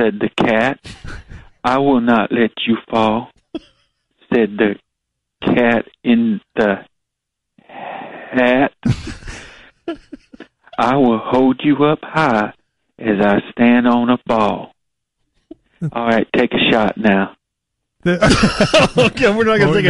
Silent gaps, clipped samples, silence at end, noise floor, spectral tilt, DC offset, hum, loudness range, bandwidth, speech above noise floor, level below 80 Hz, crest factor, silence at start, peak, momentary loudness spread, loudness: none; under 0.1%; 0 s; -79 dBFS; -6 dB/octave; under 0.1%; none; 5 LU; 11.5 kHz; 64 dB; -40 dBFS; 16 dB; 0 s; 0 dBFS; 18 LU; -15 LUFS